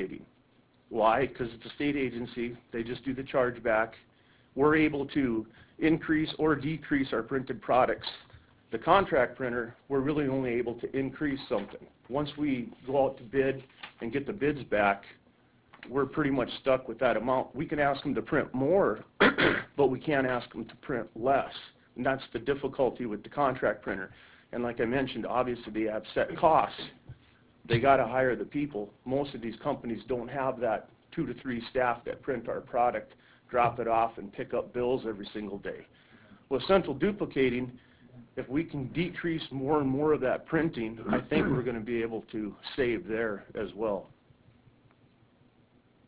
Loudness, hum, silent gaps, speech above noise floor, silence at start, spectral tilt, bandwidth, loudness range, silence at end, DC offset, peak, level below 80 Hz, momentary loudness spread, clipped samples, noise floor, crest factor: -30 LUFS; none; none; 35 dB; 0 s; -4.5 dB/octave; 4 kHz; 5 LU; 2 s; under 0.1%; -8 dBFS; -56 dBFS; 12 LU; under 0.1%; -64 dBFS; 22 dB